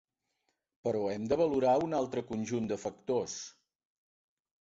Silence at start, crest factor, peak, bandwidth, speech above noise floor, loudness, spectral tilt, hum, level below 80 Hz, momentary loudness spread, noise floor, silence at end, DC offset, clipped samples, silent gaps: 0.85 s; 18 dB; -16 dBFS; 8 kHz; 50 dB; -33 LUFS; -5.5 dB/octave; none; -66 dBFS; 11 LU; -81 dBFS; 1.2 s; under 0.1%; under 0.1%; none